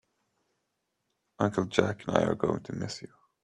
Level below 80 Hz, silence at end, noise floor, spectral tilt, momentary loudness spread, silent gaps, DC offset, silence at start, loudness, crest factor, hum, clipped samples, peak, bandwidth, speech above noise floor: -64 dBFS; 0.4 s; -81 dBFS; -6 dB/octave; 10 LU; none; under 0.1%; 1.4 s; -30 LUFS; 26 dB; none; under 0.1%; -6 dBFS; 11.5 kHz; 51 dB